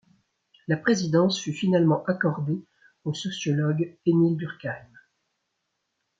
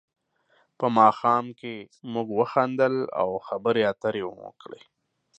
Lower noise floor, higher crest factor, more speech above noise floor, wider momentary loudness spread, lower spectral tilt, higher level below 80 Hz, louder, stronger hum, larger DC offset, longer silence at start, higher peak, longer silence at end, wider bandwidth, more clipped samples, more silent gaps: first, -79 dBFS vs -66 dBFS; about the same, 18 dB vs 22 dB; first, 54 dB vs 41 dB; second, 12 LU vs 20 LU; about the same, -6 dB/octave vs -7 dB/octave; about the same, -70 dBFS vs -70 dBFS; about the same, -25 LUFS vs -24 LUFS; neither; neither; about the same, 0.7 s vs 0.8 s; second, -8 dBFS vs -4 dBFS; first, 1.35 s vs 0.65 s; about the same, 7.8 kHz vs 8.2 kHz; neither; neither